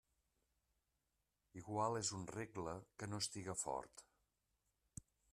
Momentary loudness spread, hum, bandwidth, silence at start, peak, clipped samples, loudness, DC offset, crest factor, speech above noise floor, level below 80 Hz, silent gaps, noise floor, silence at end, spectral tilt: 18 LU; none; 13.5 kHz; 1.55 s; -26 dBFS; under 0.1%; -45 LUFS; under 0.1%; 22 dB; 43 dB; -76 dBFS; none; -88 dBFS; 1.3 s; -3.5 dB/octave